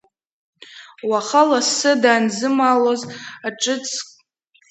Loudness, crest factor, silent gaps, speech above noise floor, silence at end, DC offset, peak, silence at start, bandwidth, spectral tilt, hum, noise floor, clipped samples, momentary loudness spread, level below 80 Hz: -18 LUFS; 18 dB; none; 41 dB; 0.65 s; under 0.1%; 0 dBFS; 0.75 s; 9 kHz; -2.5 dB/octave; none; -59 dBFS; under 0.1%; 14 LU; -74 dBFS